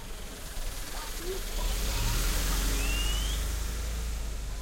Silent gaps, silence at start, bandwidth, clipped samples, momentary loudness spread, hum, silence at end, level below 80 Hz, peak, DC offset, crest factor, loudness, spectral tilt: none; 0 s; 16.5 kHz; under 0.1%; 9 LU; none; 0 s; -32 dBFS; -18 dBFS; under 0.1%; 14 dB; -33 LUFS; -3 dB/octave